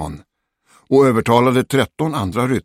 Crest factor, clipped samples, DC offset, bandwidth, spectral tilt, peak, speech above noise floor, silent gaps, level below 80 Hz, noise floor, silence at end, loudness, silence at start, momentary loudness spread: 16 dB; under 0.1%; under 0.1%; 16 kHz; -6.5 dB/octave; 0 dBFS; 43 dB; none; -46 dBFS; -58 dBFS; 0.05 s; -16 LUFS; 0 s; 7 LU